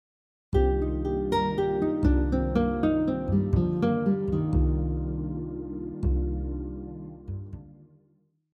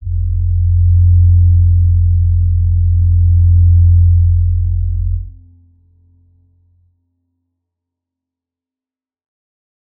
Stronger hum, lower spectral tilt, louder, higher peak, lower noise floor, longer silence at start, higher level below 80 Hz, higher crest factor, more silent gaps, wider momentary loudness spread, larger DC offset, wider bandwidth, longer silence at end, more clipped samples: neither; second, -9.5 dB/octave vs -18 dB/octave; second, -27 LUFS vs -12 LUFS; second, -10 dBFS vs -2 dBFS; second, -67 dBFS vs under -90 dBFS; first, 0.5 s vs 0 s; second, -32 dBFS vs -20 dBFS; first, 16 dB vs 10 dB; neither; first, 14 LU vs 9 LU; neither; first, 5.4 kHz vs 0.3 kHz; second, 0.8 s vs 4.7 s; neither